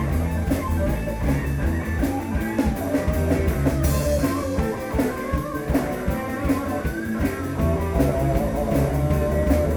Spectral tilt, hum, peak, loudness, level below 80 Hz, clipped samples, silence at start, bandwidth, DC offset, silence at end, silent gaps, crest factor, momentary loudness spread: -7 dB/octave; none; -6 dBFS; -23 LUFS; -28 dBFS; under 0.1%; 0 s; over 20 kHz; under 0.1%; 0 s; none; 16 dB; 4 LU